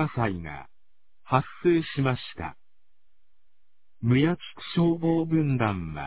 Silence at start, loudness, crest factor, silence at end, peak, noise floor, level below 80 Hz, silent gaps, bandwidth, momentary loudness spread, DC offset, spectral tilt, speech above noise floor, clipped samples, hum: 0 s; -26 LUFS; 20 dB; 0 s; -8 dBFS; -76 dBFS; -52 dBFS; none; 4 kHz; 13 LU; 0.5%; -11.5 dB/octave; 51 dB; under 0.1%; none